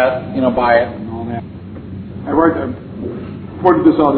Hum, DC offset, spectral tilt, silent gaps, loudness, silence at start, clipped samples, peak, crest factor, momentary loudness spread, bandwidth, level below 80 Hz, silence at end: none; under 0.1%; -11 dB/octave; none; -16 LUFS; 0 s; under 0.1%; 0 dBFS; 16 dB; 18 LU; 4.5 kHz; -42 dBFS; 0 s